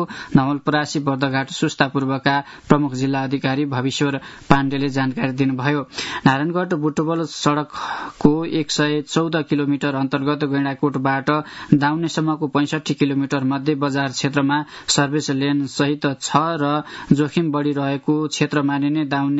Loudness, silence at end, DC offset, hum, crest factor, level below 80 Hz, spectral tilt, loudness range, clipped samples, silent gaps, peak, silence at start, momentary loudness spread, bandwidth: -20 LUFS; 0 s; under 0.1%; none; 20 dB; -50 dBFS; -5.5 dB/octave; 1 LU; under 0.1%; none; 0 dBFS; 0 s; 4 LU; 8 kHz